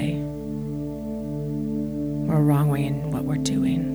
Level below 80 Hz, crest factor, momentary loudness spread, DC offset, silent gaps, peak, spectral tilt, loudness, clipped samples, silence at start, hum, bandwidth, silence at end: -44 dBFS; 14 dB; 11 LU; under 0.1%; none; -10 dBFS; -7.5 dB/octave; -25 LUFS; under 0.1%; 0 s; 60 Hz at -45 dBFS; over 20 kHz; 0 s